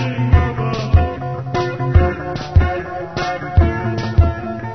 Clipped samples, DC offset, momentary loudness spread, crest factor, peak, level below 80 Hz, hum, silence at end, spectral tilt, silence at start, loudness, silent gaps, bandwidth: under 0.1%; 0.6%; 8 LU; 16 dB; 0 dBFS; -24 dBFS; none; 0 s; -8 dB/octave; 0 s; -18 LUFS; none; 6.4 kHz